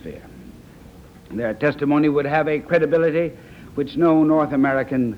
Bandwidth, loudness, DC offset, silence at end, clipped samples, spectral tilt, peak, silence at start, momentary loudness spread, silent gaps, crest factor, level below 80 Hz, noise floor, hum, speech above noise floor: 6.6 kHz; -19 LUFS; under 0.1%; 0 s; under 0.1%; -8.5 dB/octave; -4 dBFS; 0.05 s; 12 LU; none; 16 dB; -50 dBFS; -43 dBFS; none; 25 dB